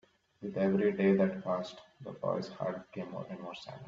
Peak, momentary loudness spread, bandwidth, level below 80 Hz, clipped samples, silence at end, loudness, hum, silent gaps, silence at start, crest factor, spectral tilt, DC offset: -16 dBFS; 17 LU; 7.4 kHz; -72 dBFS; under 0.1%; 0 s; -33 LUFS; none; none; 0.4 s; 18 dB; -8 dB/octave; under 0.1%